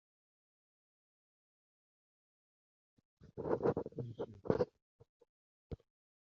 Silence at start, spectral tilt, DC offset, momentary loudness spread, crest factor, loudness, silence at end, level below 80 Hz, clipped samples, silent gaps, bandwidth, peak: 3.25 s; -8 dB/octave; under 0.1%; 17 LU; 30 dB; -40 LUFS; 0.45 s; -68 dBFS; under 0.1%; 4.82-4.99 s, 5.09-5.20 s, 5.29-5.70 s; 6.8 kHz; -16 dBFS